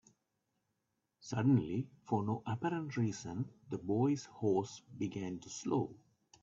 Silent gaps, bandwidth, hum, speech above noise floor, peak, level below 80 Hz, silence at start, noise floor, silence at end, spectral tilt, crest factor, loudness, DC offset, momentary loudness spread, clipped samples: none; 7.8 kHz; none; 49 dB; -20 dBFS; -72 dBFS; 1.25 s; -85 dBFS; 0.45 s; -7 dB/octave; 18 dB; -37 LUFS; under 0.1%; 11 LU; under 0.1%